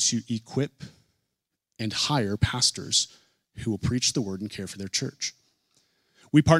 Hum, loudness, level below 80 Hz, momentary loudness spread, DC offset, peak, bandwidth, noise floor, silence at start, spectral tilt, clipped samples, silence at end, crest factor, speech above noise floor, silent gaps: none; -27 LUFS; -50 dBFS; 12 LU; under 0.1%; -4 dBFS; 14.5 kHz; -82 dBFS; 0 s; -4 dB/octave; under 0.1%; 0 s; 24 dB; 56 dB; none